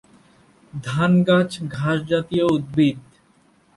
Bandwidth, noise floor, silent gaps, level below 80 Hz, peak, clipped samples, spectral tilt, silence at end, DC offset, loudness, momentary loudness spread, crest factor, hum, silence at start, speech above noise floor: 11.5 kHz; -58 dBFS; none; -54 dBFS; -6 dBFS; under 0.1%; -7 dB/octave; 0.75 s; under 0.1%; -20 LUFS; 14 LU; 16 dB; none; 0.75 s; 38 dB